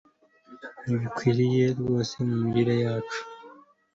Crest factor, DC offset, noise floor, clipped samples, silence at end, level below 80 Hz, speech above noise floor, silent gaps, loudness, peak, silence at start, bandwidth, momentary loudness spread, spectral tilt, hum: 18 dB; under 0.1%; -54 dBFS; under 0.1%; 0.4 s; -60 dBFS; 29 dB; none; -26 LUFS; -10 dBFS; 0.5 s; 7.8 kHz; 20 LU; -7 dB/octave; none